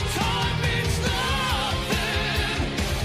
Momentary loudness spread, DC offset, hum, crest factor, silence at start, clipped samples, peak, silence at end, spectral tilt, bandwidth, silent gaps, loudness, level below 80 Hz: 2 LU; under 0.1%; none; 14 dB; 0 s; under 0.1%; -12 dBFS; 0 s; -4 dB/octave; 15.5 kHz; none; -24 LUFS; -32 dBFS